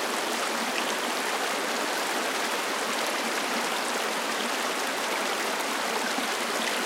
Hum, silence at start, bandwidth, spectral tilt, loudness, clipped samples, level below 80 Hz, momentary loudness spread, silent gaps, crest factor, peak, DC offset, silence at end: none; 0 s; 17 kHz; -0.5 dB/octave; -27 LUFS; under 0.1%; -88 dBFS; 1 LU; none; 16 dB; -14 dBFS; under 0.1%; 0 s